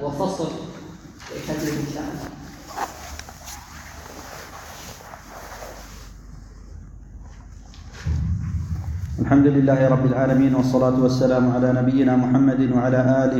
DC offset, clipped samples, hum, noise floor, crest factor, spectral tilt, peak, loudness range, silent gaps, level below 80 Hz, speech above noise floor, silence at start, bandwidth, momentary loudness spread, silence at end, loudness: under 0.1%; under 0.1%; none; -41 dBFS; 16 dB; -7.5 dB/octave; -6 dBFS; 21 LU; none; -38 dBFS; 22 dB; 0 s; 18 kHz; 22 LU; 0 s; -20 LUFS